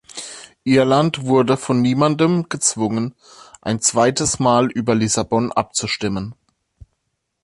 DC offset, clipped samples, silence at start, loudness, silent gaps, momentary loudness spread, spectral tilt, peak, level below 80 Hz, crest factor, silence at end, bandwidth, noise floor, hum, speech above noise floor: under 0.1%; under 0.1%; 0.15 s; -18 LUFS; none; 12 LU; -4.5 dB/octave; -2 dBFS; -50 dBFS; 16 dB; 1.1 s; 11.5 kHz; -73 dBFS; none; 56 dB